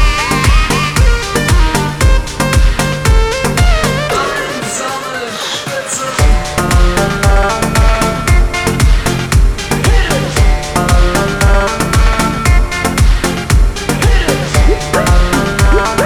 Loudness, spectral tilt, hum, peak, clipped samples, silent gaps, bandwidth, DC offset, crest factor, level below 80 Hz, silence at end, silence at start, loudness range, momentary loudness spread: -12 LUFS; -4.5 dB/octave; none; 0 dBFS; under 0.1%; none; 14 kHz; under 0.1%; 10 dB; -12 dBFS; 0 s; 0 s; 2 LU; 5 LU